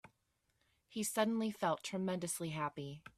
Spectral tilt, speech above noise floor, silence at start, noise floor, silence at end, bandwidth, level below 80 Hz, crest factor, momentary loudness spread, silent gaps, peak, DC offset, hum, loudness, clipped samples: -4.5 dB/octave; 43 dB; 0.9 s; -81 dBFS; 0.1 s; 15.5 kHz; -78 dBFS; 20 dB; 7 LU; none; -20 dBFS; under 0.1%; none; -39 LUFS; under 0.1%